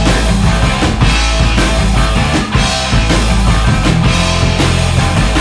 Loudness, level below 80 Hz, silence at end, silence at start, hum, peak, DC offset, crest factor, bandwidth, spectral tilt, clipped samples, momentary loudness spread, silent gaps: -12 LUFS; -14 dBFS; 0 s; 0 s; none; 0 dBFS; under 0.1%; 10 dB; 11 kHz; -4.5 dB/octave; under 0.1%; 1 LU; none